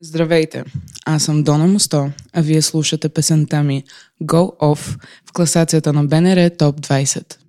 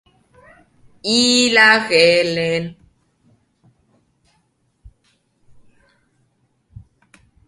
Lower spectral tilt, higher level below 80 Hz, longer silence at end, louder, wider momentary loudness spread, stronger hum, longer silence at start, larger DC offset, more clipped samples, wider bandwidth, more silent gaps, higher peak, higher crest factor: first, -5 dB/octave vs -2.5 dB/octave; first, -50 dBFS vs -56 dBFS; second, 0.15 s vs 4.75 s; about the same, -16 LUFS vs -14 LUFS; about the same, 12 LU vs 14 LU; neither; second, 0 s vs 1.05 s; neither; neither; first, 15 kHz vs 11.5 kHz; neither; about the same, 0 dBFS vs 0 dBFS; about the same, 16 dB vs 20 dB